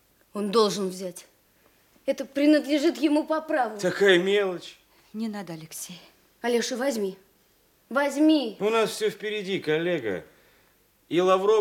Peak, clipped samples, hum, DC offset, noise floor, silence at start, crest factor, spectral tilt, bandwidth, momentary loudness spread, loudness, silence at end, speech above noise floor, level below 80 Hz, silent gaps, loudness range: -6 dBFS; under 0.1%; none; under 0.1%; -63 dBFS; 0.35 s; 20 dB; -4.5 dB/octave; 17 kHz; 16 LU; -25 LUFS; 0 s; 39 dB; -74 dBFS; none; 6 LU